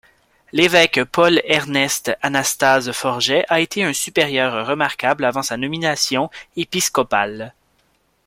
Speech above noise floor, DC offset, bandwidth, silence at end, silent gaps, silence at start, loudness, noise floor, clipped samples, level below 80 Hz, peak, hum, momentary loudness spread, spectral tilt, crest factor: 44 dB; under 0.1%; 16.5 kHz; 0.75 s; none; 0.55 s; -17 LUFS; -62 dBFS; under 0.1%; -56 dBFS; 0 dBFS; none; 8 LU; -3 dB/octave; 18 dB